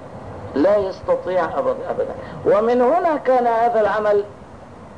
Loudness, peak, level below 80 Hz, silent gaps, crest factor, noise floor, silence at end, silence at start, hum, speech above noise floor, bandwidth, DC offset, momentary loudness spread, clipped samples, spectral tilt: -19 LUFS; -8 dBFS; -50 dBFS; none; 10 dB; -39 dBFS; 0 s; 0 s; none; 21 dB; 9.8 kHz; 0.3%; 10 LU; under 0.1%; -7 dB/octave